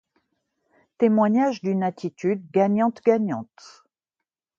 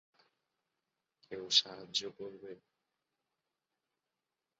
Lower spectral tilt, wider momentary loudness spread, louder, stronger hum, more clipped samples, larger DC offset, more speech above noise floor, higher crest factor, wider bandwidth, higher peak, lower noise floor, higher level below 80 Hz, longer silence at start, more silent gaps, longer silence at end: first, -8 dB/octave vs 0 dB/octave; second, 9 LU vs 21 LU; first, -22 LUFS vs -32 LUFS; neither; neither; neither; first, 64 dB vs 52 dB; second, 18 dB vs 32 dB; about the same, 7.4 kHz vs 7.4 kHz; first, -6 dBFS vs -10 dBFS; second, -86 dBFS vs -90 dBFS; first, -72 dBFS vs -86 dBFS; second, 1 s vs 1.3 s; neither; second, 1.15 s vs 2.05 s